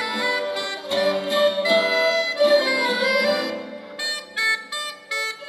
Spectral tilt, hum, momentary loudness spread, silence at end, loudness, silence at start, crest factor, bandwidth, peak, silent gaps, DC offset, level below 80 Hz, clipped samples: -2 dB/octave; none; 10 LU; 0 s; -21 LUFS; 0 s; 18 dB; 15.5 kHz; -6 dBFS; none; under 0.1%; -78 dBFS; under 0.1%